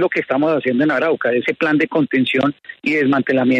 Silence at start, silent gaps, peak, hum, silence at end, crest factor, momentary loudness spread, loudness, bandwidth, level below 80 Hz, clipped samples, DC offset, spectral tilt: 0 s; none; -4 dBFS; none; 0 s; 12 dB; 3 LU; -17 LUFS; 7.8 kHz; -62 dBFS; under 0.1%; under 0.1%; -7 dB/octave